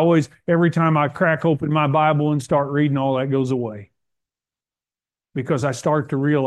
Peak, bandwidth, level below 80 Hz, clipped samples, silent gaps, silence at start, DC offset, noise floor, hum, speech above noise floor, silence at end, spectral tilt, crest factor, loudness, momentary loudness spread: -4 dBFS; 11.5 kHz; -60 dBFS; under 0.1%; none; 0 s; under 0.1%; under -90 dBFS; none; over 71 dB; 0 s; -7.5 dB/octave; 16 dB; -20 LUFS; 7 LU